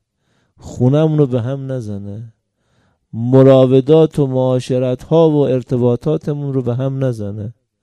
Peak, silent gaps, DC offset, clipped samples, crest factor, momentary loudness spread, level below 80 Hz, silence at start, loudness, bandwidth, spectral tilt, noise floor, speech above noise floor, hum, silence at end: 0 dBFS; none; under 0.1%; under 0.1%; 14 dB; 17 LU; -50 dBFS; 0.65 s; -14 LUFS; 10 kHz; -9 dB/octave; -63 dBFS; 49 dB; none; 0.3 s